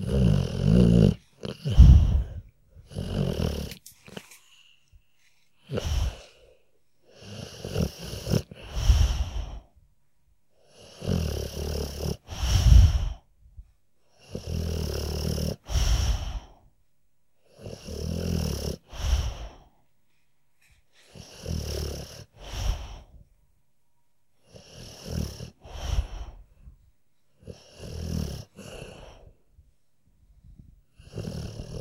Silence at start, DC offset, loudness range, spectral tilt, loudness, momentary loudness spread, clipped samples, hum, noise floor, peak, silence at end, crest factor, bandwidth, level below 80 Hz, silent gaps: 0 s; under 0.1%; 16 LU; -6.5 dB/octave; -27 LUFS; 25 LU; under 0.1%; none; -76 dBFS; -2 dBFS; 0 s; 26 dB; 16 kHz; -30 dBFS; none